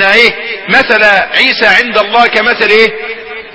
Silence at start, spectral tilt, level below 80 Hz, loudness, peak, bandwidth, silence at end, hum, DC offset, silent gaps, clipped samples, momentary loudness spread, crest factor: 0 s; -3 dB/octave; -44 dBFS; -7 LUFS; 0 dBFS; 8 kHz; 0 s; none; under 0.1%; none; 2%; 12 LU; 8 dB